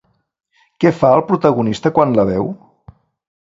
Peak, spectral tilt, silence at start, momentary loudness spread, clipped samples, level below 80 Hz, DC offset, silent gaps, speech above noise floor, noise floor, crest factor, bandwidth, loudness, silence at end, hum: 0 dBFS; -8 dB/octave; 0.8 s; 8 LU; under 0.1%; -48 dBFS; under 0.1%; none; 31 dB; -45 dBFS; 16 dB; 7.8 kHz; -15 LUFS; 0.9 s; none